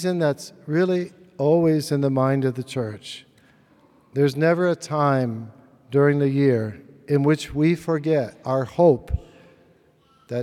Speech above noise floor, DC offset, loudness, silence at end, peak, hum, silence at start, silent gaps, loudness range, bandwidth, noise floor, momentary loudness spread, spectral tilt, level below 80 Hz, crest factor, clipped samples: 38 dB; under 0.1%; -22 LUFS; 0 s; -6 dBFS; none; 0 s; none; 3 LU; 14 kHz; -58 dBFS; 13 LU; -7.5 dB/octave; -46 dBFS; 16 dB; under 0.1%